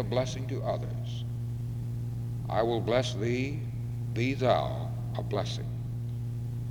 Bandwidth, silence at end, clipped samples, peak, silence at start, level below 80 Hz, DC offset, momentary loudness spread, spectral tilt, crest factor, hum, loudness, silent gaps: 10.5 kHz; 0 s; under 0.1%; -10 dBFS; 0 s; -48 dBFS; under 0.1%; 8 LU; -6.5 dB/octave; 20 dB; none; -32 LUFS; none